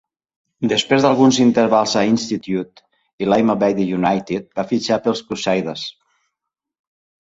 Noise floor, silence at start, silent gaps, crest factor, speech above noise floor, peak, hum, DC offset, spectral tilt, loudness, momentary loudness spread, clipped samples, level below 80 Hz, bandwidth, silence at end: -82 dBFS; 0.6 s; 3.13-3.18 s; 18 dB; 65 dB; -2 dBFS; none; under 0.1%; -5 dB/octave; -17 LUFS; 12 LU; under 0.1%; -56 dBFS; 8 kHz; 1.3 s